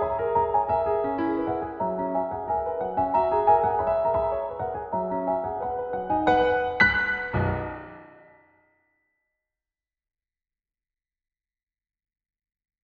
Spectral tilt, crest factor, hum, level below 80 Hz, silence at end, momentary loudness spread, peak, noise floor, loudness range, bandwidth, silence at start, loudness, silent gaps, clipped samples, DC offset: -4 dB/octave; 22 dB; none; -50 dBFS; 4.75 s; 9 LU; -6 dBFS; under -90 dBFS; 5 LU; 6.6 kHz; 0 s; -25 LUFS; none; under 0.1%; under 0.1%